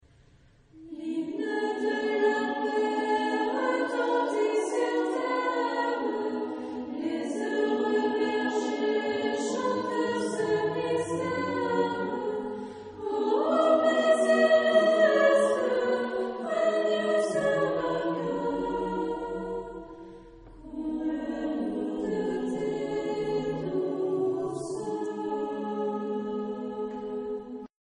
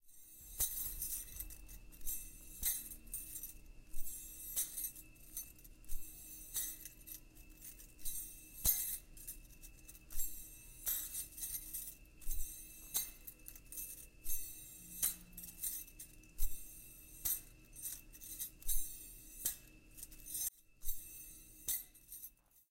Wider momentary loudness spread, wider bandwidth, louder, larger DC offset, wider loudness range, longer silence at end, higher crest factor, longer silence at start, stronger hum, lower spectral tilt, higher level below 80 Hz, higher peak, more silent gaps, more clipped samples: second, 12 LU vs 16 LU; second, 10 kHz vs 17 kHz; first, -28 LUFS vs -43 LUFS; neither; first, 9 LU vs 4 LU; first, 0.25 s vs 0.1 s; second, 18 dB vs 24 dB; first, 0.75 s vs 0.05 s; neither; first, -5 dB/octave vs -0.5 dB/octave; second, -62 dBFS vs -52 dBFS; first, -10 dBFS vs -20 dBFS; neither; neither